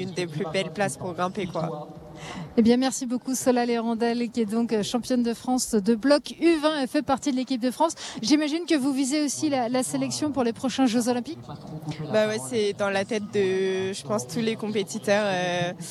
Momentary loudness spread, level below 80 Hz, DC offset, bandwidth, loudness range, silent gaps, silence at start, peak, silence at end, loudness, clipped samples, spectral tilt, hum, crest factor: 7 LU; -62 dBFS; under 0.1%; 14 kHz; 2 LU; none; 0 s; -8 dBFS; 0 s; -25 LUFS; under 0.1%; -4.5 dB/octave; none; 18 dB